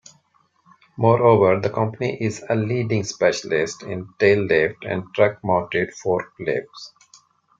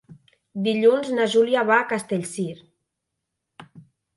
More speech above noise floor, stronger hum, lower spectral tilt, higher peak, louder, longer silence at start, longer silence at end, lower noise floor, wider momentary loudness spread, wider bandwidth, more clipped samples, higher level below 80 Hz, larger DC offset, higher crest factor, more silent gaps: second, 42 dB vs 60 dB; neither; about the same, -6 dB/octave vs -5 dB/octave; first, -2 dBFS vs -6 dBFS; about the same, -21 LUFS vs -21 LUFS; first, 1 s vs 0.1 s; first, 0.7 s vs 0.35 s; second, -63 dBFS vs -81 dBFS; about the same, 11 LU vs 12 LU; second, 7.8 kHz vs 11.5 kHz; neither; first, -60 dBFS vs -72 dBFS; neither; about the same, 20 dB vs 18 dB; neither